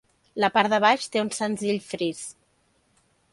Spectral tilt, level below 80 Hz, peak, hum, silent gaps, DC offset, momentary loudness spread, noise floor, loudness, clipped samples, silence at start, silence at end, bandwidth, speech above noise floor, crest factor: -3.5 dB/octave; -70 dBFS; -4 dBFS; none; none; under 0.1%; 16 LU; -67 dBFS; -24 LUFS; under 0.1%; 0.35 s; 1 s; 11.5 kHz; 43 dB; 22 dB